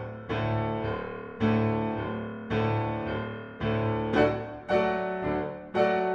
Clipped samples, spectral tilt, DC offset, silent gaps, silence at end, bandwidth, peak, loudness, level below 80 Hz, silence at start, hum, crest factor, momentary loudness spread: under 0.1%; -8.5 dB/octave; under 0.1%; none; 0 s; 7 kHz; -10 dBFS; -29 LUFS; -50 dBFS; 0 s; none; 18 dB; 9 LU